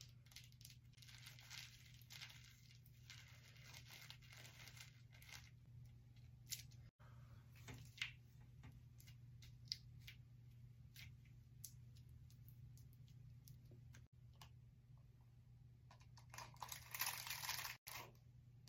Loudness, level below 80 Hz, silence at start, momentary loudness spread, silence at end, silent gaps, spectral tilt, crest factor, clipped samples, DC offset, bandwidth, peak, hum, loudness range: -56 LUFS; -72 dBFS; 0 s; 15 LU; 0 s; 6.90-6.99 s, 14.07-14.12 s, 17.78-17.86 s; -2 dB/octave; 34 dB; under 0.1%; under 0.1%; 16.5 kHz; -24 dBFS; none; 13 LU